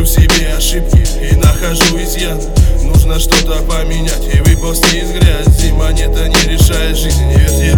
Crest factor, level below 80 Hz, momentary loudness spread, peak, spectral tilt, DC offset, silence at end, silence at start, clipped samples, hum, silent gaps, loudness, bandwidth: 10 dB; -12 dBFS; 6 LU; 0 dBFS; -4.5 dB/octave; under 0.1%; 0 s; 0 s; 0.5%; none; none; -11 LUFS; 20 kHz